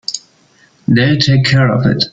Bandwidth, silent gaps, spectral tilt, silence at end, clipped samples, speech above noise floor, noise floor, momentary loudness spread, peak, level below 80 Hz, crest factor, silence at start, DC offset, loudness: 7.8 kHz; none; -5.5 dB/octave; 0.05 s; under 0.1%; 39 dB; -50 dBFS; 14 LU; 0 dBFS; -44 dBFS; 12 dB; 0.1 s; under 0.1%; -12 LUFS